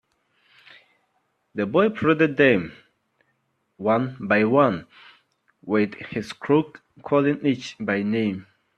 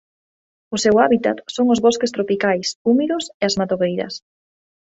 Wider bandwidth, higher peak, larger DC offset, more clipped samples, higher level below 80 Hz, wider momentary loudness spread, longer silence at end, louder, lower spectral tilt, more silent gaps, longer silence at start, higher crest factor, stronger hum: about the same, 8.8 kHz vs 8.2 kHz; about the same, -4 dBFS vs -2 dBFS; neither; neither; second, -64 dBFS vs -58 dBFS; first, 15 LU vs 9 LU; second, 0.35 s vs 0.7 s; second, -22 LUFS vs -18 LUFS; first, -7 dB/octave vs -4.5 dB/octave; second, none vs 2.76-2.85 s, 3.34-3.40 s; first, 1.55 s vs 0.7 s; about the same, 20 dB vs 16 dB; neither